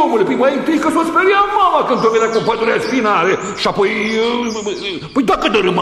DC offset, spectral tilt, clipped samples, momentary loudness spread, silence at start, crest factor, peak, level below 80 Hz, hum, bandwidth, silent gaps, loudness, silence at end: under 0.1%; -4.5 dB/octave; under 0.1%; 6 LU; 0 s; 14 dB; -2 dBFS; -46 dBFS; none; 13 kHz; none; -14 LUFS; 0 s